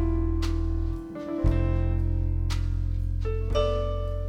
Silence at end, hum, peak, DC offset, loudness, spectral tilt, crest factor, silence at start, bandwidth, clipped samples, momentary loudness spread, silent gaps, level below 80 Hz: 0 s; none; -10 dBFS; under 0.1%; -28 LUFS; -8 dB/octave; 14 dB; 0 s; 8.2 kHz; under 0.1%; 5 LU; none; -28 dBFS